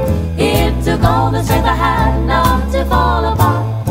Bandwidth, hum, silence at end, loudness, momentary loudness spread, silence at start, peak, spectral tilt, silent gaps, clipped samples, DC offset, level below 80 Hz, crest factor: 16.5 kHz; none; 0 s; -14 LUFS; 2 LU; 0 s; 0 dBFS; -6 dB/octave; none; under 0.1%; under 0.1%; -20 dBFS; 12 dB